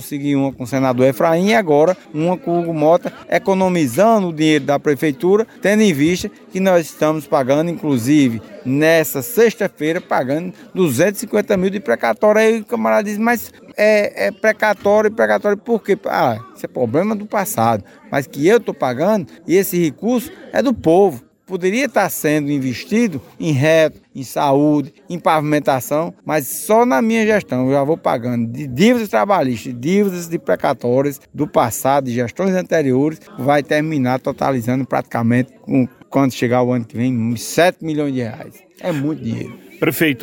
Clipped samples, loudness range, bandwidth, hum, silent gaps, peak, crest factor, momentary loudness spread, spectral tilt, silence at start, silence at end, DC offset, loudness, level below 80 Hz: under 0.1%; 2 LU; 17 kHz; none; none; -2 dBFS; 16 dB; 8 LU; -6 dB/octave; 0 s; 0 s; under 0.1%; -17 LUFS; -56 dBFS